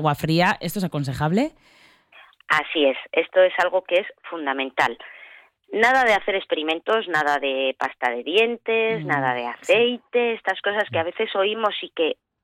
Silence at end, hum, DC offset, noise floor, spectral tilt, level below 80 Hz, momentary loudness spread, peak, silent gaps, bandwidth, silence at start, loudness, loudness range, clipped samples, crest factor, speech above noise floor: 0.3 s; none; under 0.1%; -52 dBFS; -5 dB/octave; -58 dBFS; 7 LU; -6 dBFS; none; 16.5 kHz; 0 s; -22 LUFS; 1 LU; under 0.1%; 16 dB; 30 dB